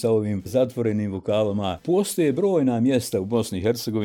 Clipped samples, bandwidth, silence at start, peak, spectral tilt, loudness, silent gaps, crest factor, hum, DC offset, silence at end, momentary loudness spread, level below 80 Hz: under 0.1%; 18.5 kHz; 0 s; -8 dBFS; -6 dB/octave; -23 LUFS; none; 14 dB; none; under 0.1%; 0 s; 4 LU; -56 dBFS